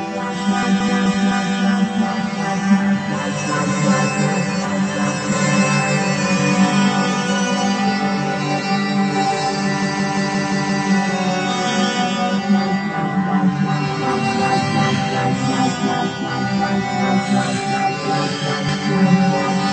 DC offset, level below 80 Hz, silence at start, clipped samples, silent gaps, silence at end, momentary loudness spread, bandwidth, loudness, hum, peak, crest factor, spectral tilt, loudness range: under 0.1%; -56 dBFS; 0 s; under 0.1%; none; 0 s; 4 LU; 9.2 kHz; -18 LUFS; none; -2 dBFS; 14 dB; -5 dB/octave; 2 LU